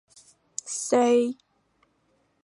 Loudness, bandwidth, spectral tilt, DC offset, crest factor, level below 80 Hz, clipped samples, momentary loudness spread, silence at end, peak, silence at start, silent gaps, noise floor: -24 LUFS; 11.5 kHz; -3 dB/octave; under 0.1%; 18 dB; -80 dBFS; under 0.1%; 17 LU; 1.1 s; -10 dBFS; 0.65 s; none; -69 dBFS